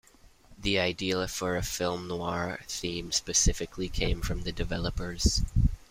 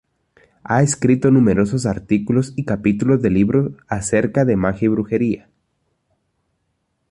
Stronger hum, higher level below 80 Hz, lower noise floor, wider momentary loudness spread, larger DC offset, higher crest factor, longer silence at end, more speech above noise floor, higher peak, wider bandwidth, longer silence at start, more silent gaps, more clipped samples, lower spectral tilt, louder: neither; first, -36 dBFS vs -44 dBFS; second, -56 dBFS vs -70 dBFS; about the same, 8 LU vs 8 LU; neither; about the same, 18 dB vs 16 dB; second, 0.15 s vs 1.75 s; second, 27 dB vs 53 dB; second, -10 dBFS vs -2 dBFS; first, 16 kHz vs 11.5 kHz; second, 0.5 s vs 0.7 s; neither; neither; second, -3.5 dB/octave vs -7 dB/octave; second, -30 LUFS vs -18 LUFS